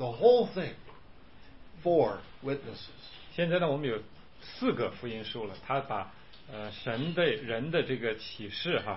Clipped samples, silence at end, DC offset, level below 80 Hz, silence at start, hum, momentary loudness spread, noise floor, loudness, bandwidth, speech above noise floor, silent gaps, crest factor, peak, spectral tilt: under 0.1%; 0 s; 0.3%; -60 dBFS; 0 s; none; 18 LU; -54 dBFS; -31 LUFS; 5.8 kHz; 24 dB; none; 22 dB; -10 dBFS; -9.5 dB/octave